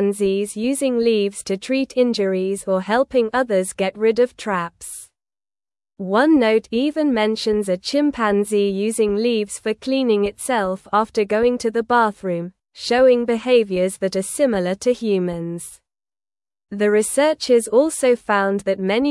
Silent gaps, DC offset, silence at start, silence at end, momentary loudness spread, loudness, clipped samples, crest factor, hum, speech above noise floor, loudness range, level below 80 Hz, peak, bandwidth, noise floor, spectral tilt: none; under 0.1%; 0 s; 0 s; 9 LU; -19 LUFS; under 0.1%; 16 dB; none; over 71 dB; 3 LU; -54 dBFS; -4 dBFS; 12 kHz; under -90 dBFS; -4.5 dB/octave